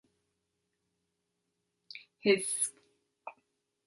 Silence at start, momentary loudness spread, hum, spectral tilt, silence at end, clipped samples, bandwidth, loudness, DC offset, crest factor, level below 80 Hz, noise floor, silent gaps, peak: 1.95 s; 22 LU; none; -2.5 dB/octave; 0.55 s; under 0.1%; 11.5 kHz; -31 LUFS; under 0.1%; 26 dB; -82 dBFS; -83 dBFS; none; -14 dBFS